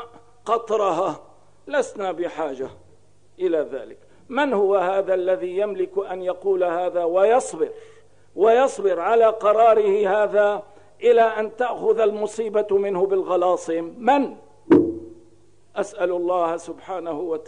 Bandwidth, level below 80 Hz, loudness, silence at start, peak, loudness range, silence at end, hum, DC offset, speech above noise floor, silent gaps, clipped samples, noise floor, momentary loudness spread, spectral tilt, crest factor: 10 kHz; -64 dBFS; -21 LUFS; 0 s; -6 dBFS; 7 LU; 0 s; 50 Hz at -60 dBFS; 0.3%; 36 dB; none; under 0.1%; -57 dBFS; 12 LU; -5 dB/octave; 16 dB